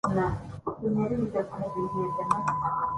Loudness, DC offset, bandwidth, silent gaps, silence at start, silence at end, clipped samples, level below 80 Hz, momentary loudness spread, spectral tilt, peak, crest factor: -30 LUFS; under 0.1%; 11.5 kHz; none; 0.05 s; 0 s; under 0.1%; -50 dBFS; 6 LU; -8 dB/octave; -8 dBFS; 20 dB